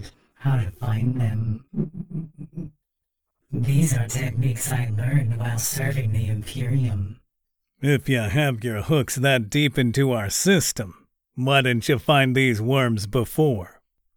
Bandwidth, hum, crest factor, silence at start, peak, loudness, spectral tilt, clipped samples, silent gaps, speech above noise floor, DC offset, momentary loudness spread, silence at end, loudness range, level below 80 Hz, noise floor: 19.5 kHz; none; 18 dB; 0 s; -6 dBFS; -22 LUFS; -5 dB/octave; under 0.1%; none; 59 dB; under 0.1%; 13 LU; 0.05 s; 6 LU; -48 dBFS; -81 dBFS